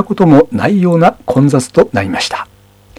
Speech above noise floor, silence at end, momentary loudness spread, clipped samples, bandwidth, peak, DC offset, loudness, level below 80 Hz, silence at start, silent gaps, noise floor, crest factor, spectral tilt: 32 dB; 0.55 s; 9 LU; 0.4%; 13.5 kHz; 0 dBFS; under 0.1%; -11 LUFS; -42 dBFS; 0 s; none; -42 dBFS; 12 dB; -6.5 dB/octave